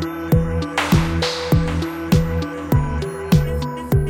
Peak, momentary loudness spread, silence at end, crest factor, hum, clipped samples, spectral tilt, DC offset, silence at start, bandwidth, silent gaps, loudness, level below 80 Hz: -4 dBFS; 7 LU; 0 s; 14 dB; none; under 0.1%; -6.5 dB/octave; under 0.1%; 0 s; 17 kHz; none; -20 LUFS; -28 dBFS